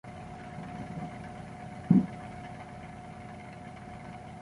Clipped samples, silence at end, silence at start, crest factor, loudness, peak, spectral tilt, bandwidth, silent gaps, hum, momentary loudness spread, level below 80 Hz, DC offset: under 0.1%; 0 s; 0.05 s; 26 dB; -36 LUFS; -10 dBFS; -8.5 dB/octave; 11.5 kHz; none; none; 19 LU; -56 dBFS; under 0.1%